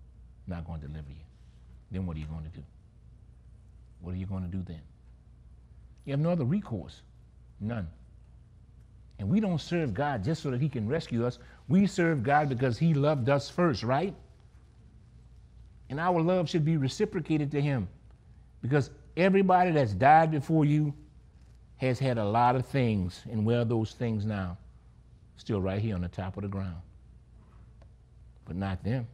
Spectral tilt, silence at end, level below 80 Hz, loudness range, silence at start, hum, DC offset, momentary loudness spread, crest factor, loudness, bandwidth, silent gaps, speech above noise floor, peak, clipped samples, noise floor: -7.5 dB/octave; 0 s; -52 dBFS; 15 LU; 0 s; none; under 0.1%; 16 LU; 22 dB; -29 LUFS; 11 kHz; none; 27 dB; -8 dBFS; under 0.1%; -55 dBFS